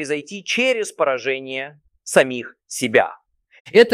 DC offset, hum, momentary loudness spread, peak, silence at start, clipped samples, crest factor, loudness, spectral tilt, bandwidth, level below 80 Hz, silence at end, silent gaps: under 0.1%; none; 13 LU; 0 dBFS; 0 s; under 0.1%; 20 dB; -20 LUFS; -3 dB/octave; 15 kHz; -66 dBFS; 0 s; 3.60-3.65 s